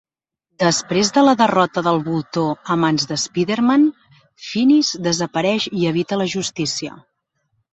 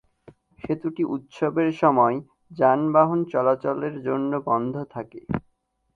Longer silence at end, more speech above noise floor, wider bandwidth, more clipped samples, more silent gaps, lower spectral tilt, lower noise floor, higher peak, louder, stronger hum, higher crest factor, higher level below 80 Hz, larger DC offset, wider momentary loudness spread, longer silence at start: first, 0.75 s vs 0.55 s; first, 59 dB vs 47 dB; first, 8.2 kHz vs 7.2 kHz; neither; neither; second, -4.5 dB/octave vs -9 dB/octave; first, -76 dBFS vs -69 dBFS; about the same, -2 dBFS vs -4 dBFS; first, -18 LUFS vs -23 LUFS; neither; about the same, 18 dB vs 20 dB; about the same, -60 dBFS vs -58 dBFS; neither; second, 8 LU vs 14 LU; about the same, 0.6 s vs 0.65 s